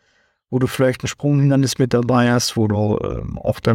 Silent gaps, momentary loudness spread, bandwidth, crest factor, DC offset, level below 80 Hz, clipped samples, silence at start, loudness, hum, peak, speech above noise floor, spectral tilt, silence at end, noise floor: none; 8 LU; 16.5 kHz; 14 dB; under 0.1%; -42 dBFS; under 0.1%; 0.5 s; -18 LUFS; none; -4 dBFS; 45 dB; -6 dB/octave; 0 s; -62 dBFS